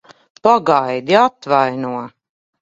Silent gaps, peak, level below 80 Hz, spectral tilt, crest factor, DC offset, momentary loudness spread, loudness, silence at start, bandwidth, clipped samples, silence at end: none; 0 dBFS; -62 dBFS; -5.5 dB/octave; 16 dB; under 0.1%; 12 LU; -15 LUFS; 0.45 s; 7.8 kHz; under 0.1%; 0.55 s